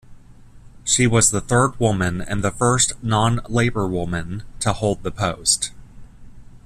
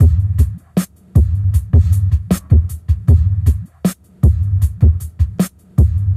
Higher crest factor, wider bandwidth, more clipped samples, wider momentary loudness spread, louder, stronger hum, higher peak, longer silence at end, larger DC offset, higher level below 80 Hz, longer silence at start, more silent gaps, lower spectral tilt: first, 20 dB vs 14 dB; about the same, 14 kHz vs 15 kHz; neither; about the same, 9 LU vs 8 LU; second, -20 LUFS vs -16 LUFS; neither; about the same, -2 dBFS vs 0 dBFS; about the same, 0.1 s vs 0 s; neither; second, -40 dBFS vs -18 dBFS; about the same, 0.1 s vs 0 s; neither; second, -4 dB/octave vs -8 dB/octave